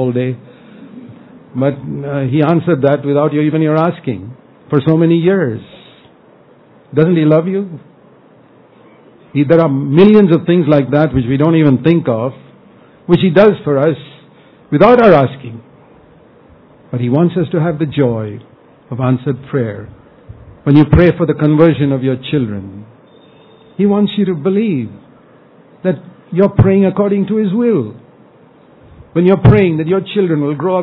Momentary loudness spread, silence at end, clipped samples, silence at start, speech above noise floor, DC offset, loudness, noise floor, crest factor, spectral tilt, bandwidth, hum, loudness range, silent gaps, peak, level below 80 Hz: 14 LU; 0 s; 0.5%; 0 s; 33 dB; under 0.1%; -12 LUFS; -44 dBFS; 14 dB; -11 dB/octave; 5.4 kHz; none; 6 LU; none; 0 dBFS; -38 dBFS